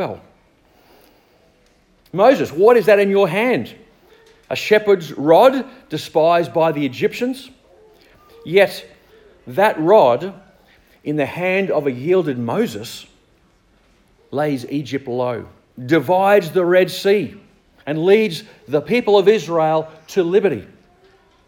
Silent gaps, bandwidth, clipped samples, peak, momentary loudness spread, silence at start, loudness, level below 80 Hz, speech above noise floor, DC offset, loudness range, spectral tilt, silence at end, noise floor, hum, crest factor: none; 17 kHz; under 0.1%; 0 dBFS; 16 LU; 0 s; -17 LUFS; -60 dBFS; 40 dB; under 0.1%; 6 LU; -6 dB/octave; 0.85 s; -56 dBFS; none; 18 dB